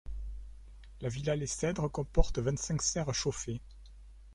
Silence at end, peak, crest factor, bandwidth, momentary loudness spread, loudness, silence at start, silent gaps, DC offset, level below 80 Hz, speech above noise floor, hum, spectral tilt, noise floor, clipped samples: 0 s; -8 dBFS; 24 dB; 11.5 kHz; 17 LU; -34 LUFS; 0.05 s; none; under 0.1%; -40 dBFS; 20 dB; none; -4.5 dB/octave; -52 dBFS; under 0.1%